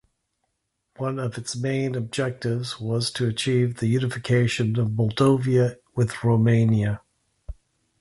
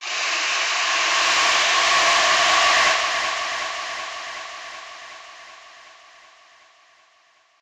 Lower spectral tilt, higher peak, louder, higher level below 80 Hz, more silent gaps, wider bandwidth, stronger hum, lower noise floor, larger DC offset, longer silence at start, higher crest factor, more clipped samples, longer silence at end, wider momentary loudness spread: first, -6.5 dB/octave vs 1.5 dB/octave; about the same, -6 dBFS vs -6 dBFS; second, -24 LUFS vs -18 LUFS; first, -50 dBFS vs -62 dBFS; neither; second, 11.5 kHz vs 16 kHz; neither; first, -77 dBFS vs -59 dBFS; neither; first, 1 s vs 0 s; about the same, 18 dB vs 18 dB; neither; second, 0.5 s vs 1.8 s; second, 10 LU vs 21 LU